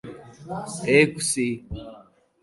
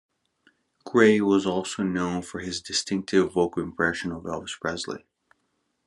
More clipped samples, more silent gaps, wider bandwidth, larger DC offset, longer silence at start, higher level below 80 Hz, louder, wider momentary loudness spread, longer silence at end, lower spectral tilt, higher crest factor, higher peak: neither; neither; about the same, 12 kHz vs 11.5 kHz; neither; second, 0.05 s vs 0.85 s; first, -50 dBFS vs -66 dBFS; first, -22 LUFS vs -25 LUFS; first, 24 LU vs 14 LU; second, 0.4 s vs 0.9 s; about the same, -4 dB/octave vs -4.5 dB/octave; about the same, 22 dB vs 22 dB; about the same, -4 dBFS vs -4 dBFS